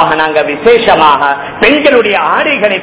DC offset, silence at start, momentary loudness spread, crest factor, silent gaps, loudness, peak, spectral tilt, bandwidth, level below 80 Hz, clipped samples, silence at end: under 0.1%; 0 s; 4 LU; 8 dB; none; -8 LUFS; 0 dBFS; -8 dB/octave; 4 kHz; -42 dBFS; 4%; 0 s